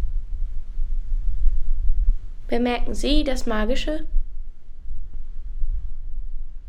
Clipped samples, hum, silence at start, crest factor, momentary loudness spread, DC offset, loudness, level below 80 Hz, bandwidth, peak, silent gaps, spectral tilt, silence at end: under 0.1%; none; 0 s; 16 dB; 16 LU; under 0.1%; -28 LUFS; -22 dBFS; 8.8 kHz; -4 dBFS; none; -5.5 dB/octave; 0 s